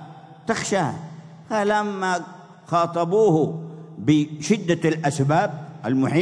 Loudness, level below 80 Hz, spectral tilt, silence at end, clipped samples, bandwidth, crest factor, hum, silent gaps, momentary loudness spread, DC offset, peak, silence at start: -22 LUFS; -62 dBFS; -6 dB/octave; 0 s; under 0.1%; 11 kHz; 16 dB; none; none; 16 LU; under 0.1%; -6 dBFS; 0 s